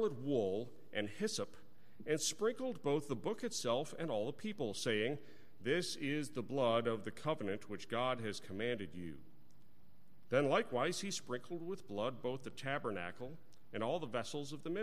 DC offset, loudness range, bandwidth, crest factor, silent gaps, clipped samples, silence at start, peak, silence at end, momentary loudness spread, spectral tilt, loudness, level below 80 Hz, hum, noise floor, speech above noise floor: 0.4%; 4 LU; 16 kHz; 20 dB; none; under 0.1%; 0 s; -20 dBFS; 0 s; 10 LU; -4.5 dB/octave; -40 LUFS; -74 dBFS; none; -69 dBFS; 30 dB